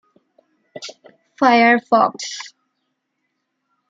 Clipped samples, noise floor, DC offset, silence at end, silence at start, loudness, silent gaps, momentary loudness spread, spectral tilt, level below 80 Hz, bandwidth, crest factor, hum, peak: under 0.1%; -74 dBFS; under 0.1%; 1.45 s; 0.75 s; -16 LUFS; none; 22 LU; -3.5 dB/octave; -74 dBFS; 7.8 kHz; 18 dB; none; -2 dBFS